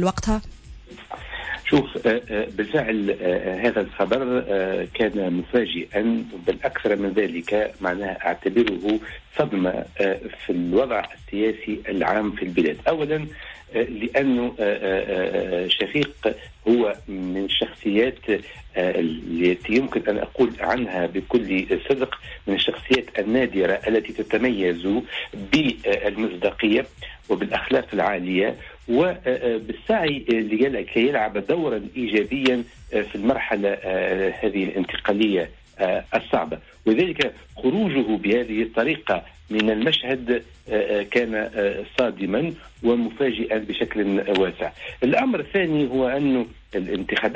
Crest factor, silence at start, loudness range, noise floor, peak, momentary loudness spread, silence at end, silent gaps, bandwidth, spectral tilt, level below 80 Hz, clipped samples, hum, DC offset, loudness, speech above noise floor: 16 dB; 0 s; 1 LU; -42 dBFS; -6 dBFS; 6 LU; 0 s; none; 8 kHz; -6 dB/octave; -46 dBFS; under 0.1%; none; under 0.1%; -23 LUFS; 19 dB